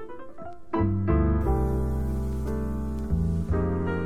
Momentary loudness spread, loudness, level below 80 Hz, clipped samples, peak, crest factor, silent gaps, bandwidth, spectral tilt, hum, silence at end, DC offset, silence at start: 12 LU; -27 LUFS; -30 dBFS; under 0.1%; -10 dBFS; 16 dB; none; 15.5 kHz; -9.5 dB/octave; none; 0 s; 1%; 0 s